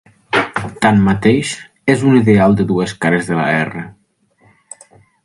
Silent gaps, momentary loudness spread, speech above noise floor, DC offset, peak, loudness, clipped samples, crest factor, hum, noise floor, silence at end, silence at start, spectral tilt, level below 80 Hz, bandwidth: none; 11 LU; 43 dB; under 0.1%; 0 dBFS; -14 LUFS; under 0.1%; 16 dB; none; -56 dBFS; 1.35 s; 0.3 s; -6.5 dB/octave; -44 dBFS; 11.5 kHz